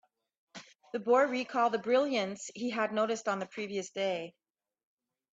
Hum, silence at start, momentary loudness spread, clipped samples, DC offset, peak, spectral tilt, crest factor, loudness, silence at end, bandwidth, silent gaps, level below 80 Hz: none; 0.55 s; 20 LU; under 0.1%; under 0.1%; -16 dBFS; -4 dB/octave; 18 dB; -32 LUFS; 1.05 s; 8 kHz; none; -82 dBFS